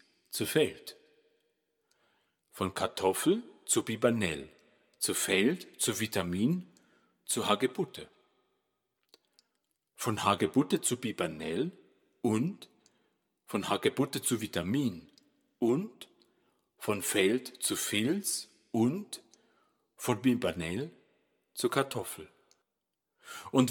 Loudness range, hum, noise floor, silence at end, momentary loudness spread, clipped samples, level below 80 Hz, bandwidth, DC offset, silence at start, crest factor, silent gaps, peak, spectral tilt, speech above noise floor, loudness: 4 LU; none; -86 dBFS; 0 s; 13 LU; under 0.1%; -70 dBFS; 19 kHz; under 0.1%; 0.3 s; 24 dB; none; -8 dBFS; -4 dB/octave; 55 dB; -32 LUFS